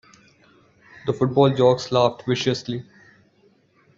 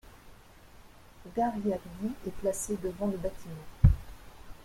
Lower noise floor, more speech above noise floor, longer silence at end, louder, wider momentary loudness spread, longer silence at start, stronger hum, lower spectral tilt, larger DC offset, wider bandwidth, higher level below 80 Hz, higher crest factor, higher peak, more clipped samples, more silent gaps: first, -59 dBFS vs -54 dBFS; first, 40 dB vs 23 dB; first, 1.15 s vs 0 s; first, -21 LUFS vs -32 LUFS; second, 15 LU vs 24 LU; first, 1.05 s vs 0.05 s; neither; about the same, -6.5 dB/octave vs -7 dB/octave; neither; second, 7.6 kHz vs 16.5 kHz; second, -60 dBFS vs -38 dBFS; second, 18 dB vs 26 dB; about the same, -4 dBFS vs -6 dBFS; neither; neither